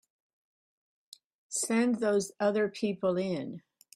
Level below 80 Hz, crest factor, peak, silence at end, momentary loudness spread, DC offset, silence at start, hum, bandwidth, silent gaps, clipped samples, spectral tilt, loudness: -76 dBFS; 16 dB; -16 dBFS; 0.35 s; 9 LU; under 0.1%; 1.5 s; none; 15.5 kHz; none; under 0.1%; -4.5 dB/octave; -30 LUFS